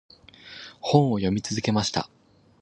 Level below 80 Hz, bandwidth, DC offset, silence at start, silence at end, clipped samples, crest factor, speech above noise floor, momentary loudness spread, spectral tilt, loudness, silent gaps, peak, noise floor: -52 dBFS; 10 kHz; under 0.1%; 0.45 s; 0.55 s; under 0.1%; 22 dB; 23 dB; 20 LU; -5.5 dB/octave; -24 LUFS; none; -4 dBFS; -47 dBFS